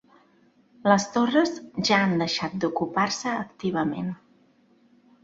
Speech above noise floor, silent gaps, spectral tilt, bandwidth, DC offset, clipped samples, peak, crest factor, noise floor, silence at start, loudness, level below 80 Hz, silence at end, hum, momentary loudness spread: 36 dB; none; -4.5 dB/octave; 8 kHz; under 0.1%; under 0.1%; -4 dBFS; 22 dB; -61 dBFS; 0.85 s; -25 LUFS; -64 dBFS; 1.1 s; none; 8 LU